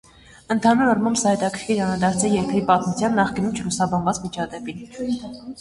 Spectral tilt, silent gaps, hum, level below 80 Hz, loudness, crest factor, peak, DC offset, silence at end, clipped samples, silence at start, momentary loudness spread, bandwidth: -5 dB/octave; none; none; -50 dBFS; -21 LUFS; 18 dB; -4 dBFS; under 0.1%; 0 s; under 0.1%; 0.5 s; 11 LU; 11.5 kHz